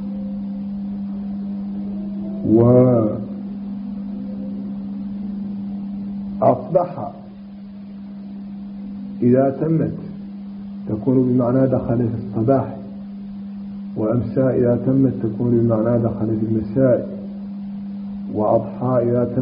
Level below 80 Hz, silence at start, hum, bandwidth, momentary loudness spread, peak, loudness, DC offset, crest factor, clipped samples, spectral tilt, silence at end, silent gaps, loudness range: -50 dBFS; 0 s; none; 5 kHz; 16 LU; -2 dBFS; -20 LUFS; under 0.1%; 18 dB; under 0.1%; -11 dB/octave; 0 s; none; 5 LU